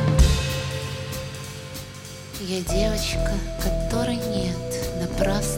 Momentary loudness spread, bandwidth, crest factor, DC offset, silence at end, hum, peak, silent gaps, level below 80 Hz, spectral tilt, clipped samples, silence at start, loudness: 13 LU; 17 kHz; 18 dB; under 0.1%; 0 s; none; -6 dBFS; none; -28 dBFS; -5 dB/octave; under 0.1%; 0 s; -26 LUFS